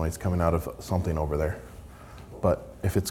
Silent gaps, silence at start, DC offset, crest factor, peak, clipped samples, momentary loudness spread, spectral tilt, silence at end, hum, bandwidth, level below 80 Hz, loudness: none; 0 s; under 0.1%; 20 dB; -8 dBFS; under 0.1%; 20 LU; -6.5 dB/octave; 0 s; none; 17 kHz; -42 dBFS; -28 LUFS